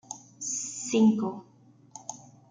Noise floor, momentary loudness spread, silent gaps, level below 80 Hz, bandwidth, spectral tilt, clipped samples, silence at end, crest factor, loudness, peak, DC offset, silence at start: -51 dBFS; 22 LU; none; -76 dBFS; 9.6 kHz; -4.5 dB/octave; under 0.1%; 0.35 s; 18 dB; -27 LUFS; -12 dBFS; under 0.1%; 0.1 s